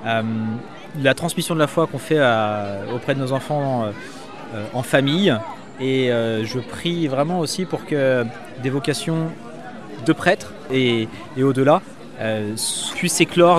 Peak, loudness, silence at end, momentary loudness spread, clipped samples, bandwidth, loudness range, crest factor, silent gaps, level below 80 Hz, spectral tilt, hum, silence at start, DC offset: 0 dBFS; -21 LUFS; 0 s; 11 LU; under 0.1%; 15 kHz; 2 LU; 20 dB; none; -58 dBFS; -5 dB/octave; none; 0 s; 0.8%